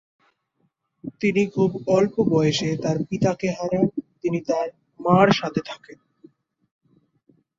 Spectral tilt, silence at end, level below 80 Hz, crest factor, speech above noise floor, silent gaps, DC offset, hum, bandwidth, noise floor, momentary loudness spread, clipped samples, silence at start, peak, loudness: -6.5 dB/octave; 1.65 s; -58 dBFS; 20 dB; 49 dB; none; under 0.1%; none; 7.8 kHz; -71 dBFS; 12 LU; under 0.1%; 1.05 s; -4 dBFS; -22 LUFS